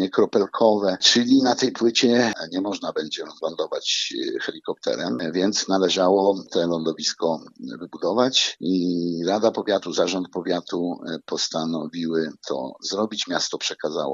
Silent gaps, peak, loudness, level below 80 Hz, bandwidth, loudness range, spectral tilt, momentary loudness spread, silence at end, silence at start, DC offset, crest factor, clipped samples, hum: none; -2 dBFS; -22 LUFS; -70 dBFS; 7.8 kHz; 6 LU; -3.5 dB/octave; 11 LU; 0 s; 0 s; under 0.1%; 20 dB; under 0.1%; none